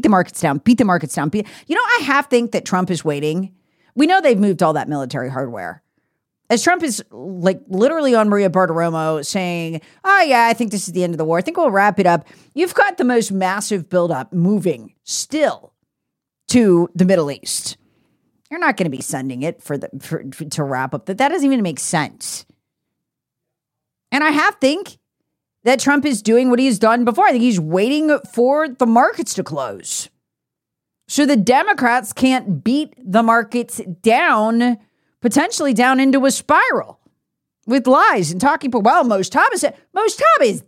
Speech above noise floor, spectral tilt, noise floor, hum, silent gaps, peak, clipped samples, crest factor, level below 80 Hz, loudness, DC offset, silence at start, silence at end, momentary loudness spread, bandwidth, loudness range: 65 dB; -4.5 dB/octave; -82 dBFS; none; none; -2 dBFS; under 0.1%; 14 dB; -60 dBFS; -16 LUFS; under 0.1%; 0 s; 0.05 s; 11 LU; 16.5 kHz; 6 LU